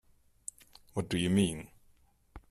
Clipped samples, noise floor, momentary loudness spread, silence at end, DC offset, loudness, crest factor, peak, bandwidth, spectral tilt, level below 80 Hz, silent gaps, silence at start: under 0.1%; -65 dBFS; 18 LU; 0.1 s; under 0.1%; -32 LUFS; 20 dB; -16 dBFS; 14 kHz; -5.5 dB/octave; -60 dBFS; none; 0.95 s